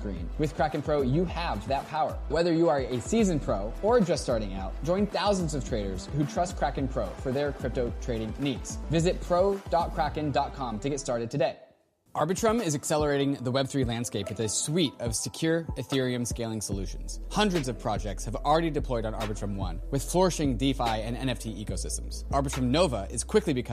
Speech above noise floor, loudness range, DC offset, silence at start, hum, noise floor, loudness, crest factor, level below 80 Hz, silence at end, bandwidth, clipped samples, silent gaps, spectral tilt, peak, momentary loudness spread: 35 dB; 3 LU; under 0.1%; 0 s; none; -63 dBFS; -29 LUFS; 18 dB; -38 dBFS; 0 s; 15.5 kHz; under 0.1%; none; -5 dB/octave; -10 dBFS; 7 LU